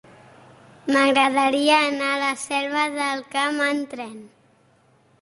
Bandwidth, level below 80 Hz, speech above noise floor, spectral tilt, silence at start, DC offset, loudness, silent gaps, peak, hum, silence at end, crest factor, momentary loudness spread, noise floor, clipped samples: 11.5 kHz; -70 dBFS; 37 dB; -2 dB/octave; 0.85 s; under 0.1%; -20 LUFS; none; -6 dBFS; none; 0.95 s; 18 dB; 13 LU; -59 dBFS; under 0.1%